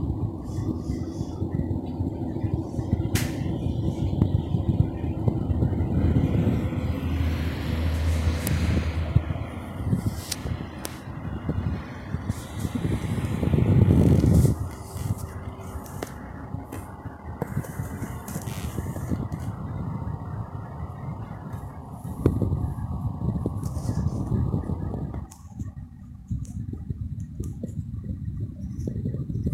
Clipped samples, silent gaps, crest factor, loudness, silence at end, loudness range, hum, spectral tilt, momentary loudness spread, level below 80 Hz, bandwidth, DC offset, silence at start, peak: under 0.1%; none; 22 dB; -28 LUFS; 0 s; 11 LU; none; -7.5 dB/octave; 13 LU; -36 dBFS; 16 kHz; under 0.1%; 0 s; -6 dBFS